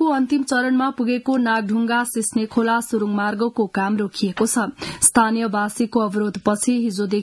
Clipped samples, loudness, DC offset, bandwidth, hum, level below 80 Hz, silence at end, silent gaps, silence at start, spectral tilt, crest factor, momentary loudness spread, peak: under 0.1%; -20 LUFS; under 0.1%; 12 kHz; none; -56 dBFS; 0 s; none; 0 s; -4 dB/octave; 20 dB; 5 LU; 0 dBFS